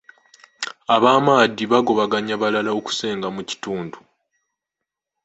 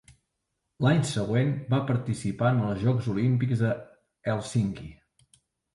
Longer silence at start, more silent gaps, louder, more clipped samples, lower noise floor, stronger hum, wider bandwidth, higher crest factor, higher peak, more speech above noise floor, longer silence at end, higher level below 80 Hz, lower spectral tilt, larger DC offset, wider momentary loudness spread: second, 0.6 s vs 0.8 s; neither; first, -19 LUFS vs -27 LUFS; neither; about the same, -84 dBFS vs -81 dBFS; neither; second, 8.2 kHz vs 11.5 kHz; about the same, 20 dB vs 16 dB; first, 0 dBFS vs -10 dBFS; first, 65 dB vs 55 dB; first, 1.25 s vs 0.8 s; second, -64 dBFS vs -56 dBFS; second, -4.5 dB/octave vs -7 dB/octave; neither; first, 15 LU vs 7 LU